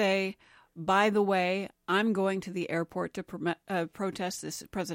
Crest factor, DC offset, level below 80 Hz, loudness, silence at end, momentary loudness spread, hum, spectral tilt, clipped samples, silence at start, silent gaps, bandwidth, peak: 18 dB; under 0.1%; -66 dBFS; -30 LUFS; 0 s; 10 LU; none; -5 dB/octave; under 0.1%; 0 s; none; 16.5 kHz; -12 dBFS